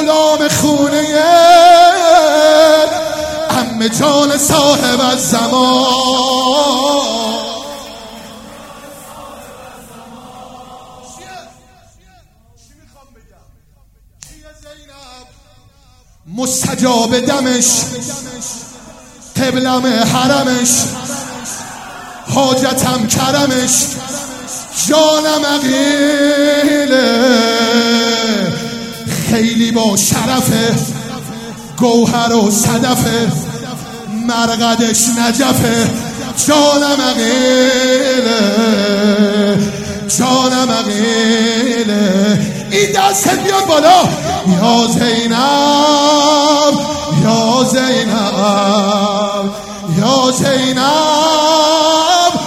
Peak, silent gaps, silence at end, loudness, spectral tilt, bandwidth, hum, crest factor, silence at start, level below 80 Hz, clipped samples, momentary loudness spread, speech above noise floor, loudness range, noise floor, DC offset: 0 dBFS; none; 0 s; -11 LUFS; -3.5 dB/octave; 16.5 kHz; none; 12 dB; 0 s; -46 dBFS; under 0.1%; 14 LU; 37 dB; 5 LU; -48 dBFS; under 0.1%